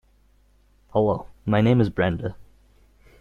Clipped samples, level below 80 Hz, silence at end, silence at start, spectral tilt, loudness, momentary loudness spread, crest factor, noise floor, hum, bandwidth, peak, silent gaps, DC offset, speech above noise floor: under 0.1%; -48 dBFS; 0.8 s; 0.95 s; -9 dB/octave; -23 LUFS; 11 LU; 18 dB; -59 dBFS; none; 6.8 kHz; -6 dBFS; none; under 0.1%; 38 dB